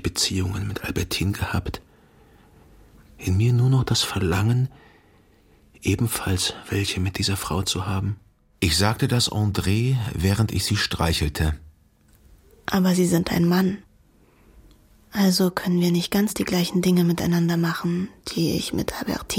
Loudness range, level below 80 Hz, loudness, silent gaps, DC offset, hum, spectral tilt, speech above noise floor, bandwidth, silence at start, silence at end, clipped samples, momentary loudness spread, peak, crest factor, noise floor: 3 LU; -40 dBFS; -23 LUFS; none; under 0.1%; none; -5 dB/octave; 35 dB; 17 kHz; 0 s; 0 s; under 0.1%; 8 LU; -4 dBFS; 20 dB; -57 dBFS